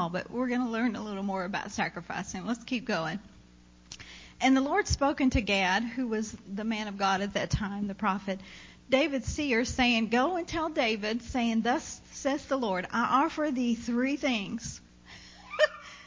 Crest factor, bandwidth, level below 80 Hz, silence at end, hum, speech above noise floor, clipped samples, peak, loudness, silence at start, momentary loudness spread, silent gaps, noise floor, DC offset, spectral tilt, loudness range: 18 dB; 7.6 kHz; -48 dBFS; 0 s; 60 Hz at -60 dBFS; 27 dB; under 0.1%; -12 dBFS; -29 LUFS; 0 s; 13 LU; none; -56 dBFS; under 0.1%; -4.5 dB/octave; 4 LU